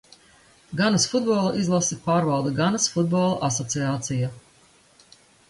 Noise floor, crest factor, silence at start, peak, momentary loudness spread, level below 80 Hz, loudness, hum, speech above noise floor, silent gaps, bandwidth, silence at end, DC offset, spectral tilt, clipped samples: -57 dBFS; 16 dB; 0.7 s; -8 dBFS; 5 LU; -58 dBFS; -23 LUFS; none; 34 dB; none; 11.5 kHz; 1.1 s; under 0.1%; -4.5 dB/octave; under 0.1%